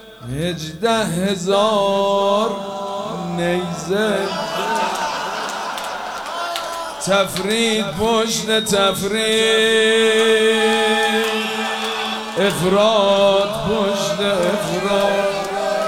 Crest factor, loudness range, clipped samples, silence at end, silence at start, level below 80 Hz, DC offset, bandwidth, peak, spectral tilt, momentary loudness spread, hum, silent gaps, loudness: 14 dB; 6 LU; under 0.1%; 0 s; 0 s; -50 dBFS; under 0.1%; 16.5 kHz; -4 dBFS; -3.5 dB/octave; 11 LU; none; none; -18 LUFS